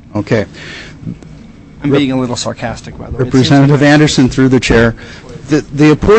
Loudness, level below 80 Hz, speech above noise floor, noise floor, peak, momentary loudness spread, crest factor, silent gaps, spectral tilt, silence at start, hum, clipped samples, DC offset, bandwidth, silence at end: -11 LUFS; -30 dBFS; 23 dB; -34 dBFS; 0 dBFS; 20 LU; 12 dB; none; -6 dB/octave; 0.15 s; none; under 0.1%; under 0.1%; 8.6 kHz; 0 s